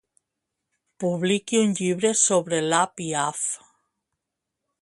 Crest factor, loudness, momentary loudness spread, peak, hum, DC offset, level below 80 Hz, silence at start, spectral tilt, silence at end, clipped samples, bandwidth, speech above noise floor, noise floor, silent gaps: 20 dB; -23 LUFS; 9 LU; -6 dBFS; none; under 0.1%; -70 dBFS; 1 s; -3.5 dB/octave; 1.25 s; under 0.1%; 11.5 kHz; 60 dB; -83 dBFS; none